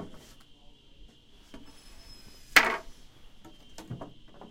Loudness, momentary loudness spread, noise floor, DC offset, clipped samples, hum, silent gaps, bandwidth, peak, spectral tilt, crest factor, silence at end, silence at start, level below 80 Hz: -24 LUFS; 29 LU; -54 dBFS; under 0.1%; under 0.1%; none; none; 16 kHz; -4 dBFS; -1.5 dB/octave; 32 dB; 0.05 s; 0 s; -54 dBFS